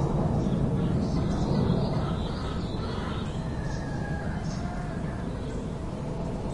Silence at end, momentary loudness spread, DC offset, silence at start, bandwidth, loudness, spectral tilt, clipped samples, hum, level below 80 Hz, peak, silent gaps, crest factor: 0 s; 7 LU; under 0.1%; 0 s; 11 kHz; -30 LUFS; -7.5 dB/octave; under 0.1%; none; -38 dBFS; -14 dBFS; none; 16 dB